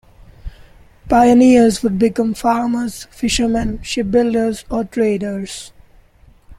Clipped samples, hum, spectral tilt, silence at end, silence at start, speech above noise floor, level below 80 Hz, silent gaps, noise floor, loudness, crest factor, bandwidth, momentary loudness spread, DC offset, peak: under 0.1%; none; -5 dB/octave; 0.05 s; 0.45 s; 33 dB; -36 dBFS; none; -48 dBFS; -16 LUFS; 14 dB; 14.5 kHz; 13 LU; under 0.1%; -2 dBFS